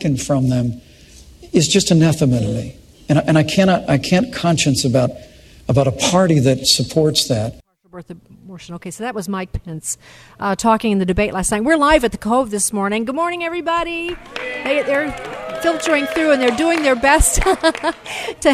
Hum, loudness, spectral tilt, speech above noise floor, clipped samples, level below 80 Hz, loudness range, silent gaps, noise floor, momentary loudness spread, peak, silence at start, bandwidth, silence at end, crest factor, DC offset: none; -17 LUFS; -4.5 dB/octave; 26 dB; under 0.1%; -34 dBFS; 5 LU; none; -43 dBFS; 13 LU; 0 dBFS; 0 s; 14.5 kHz; 0 s; 16 dB; under 0.1%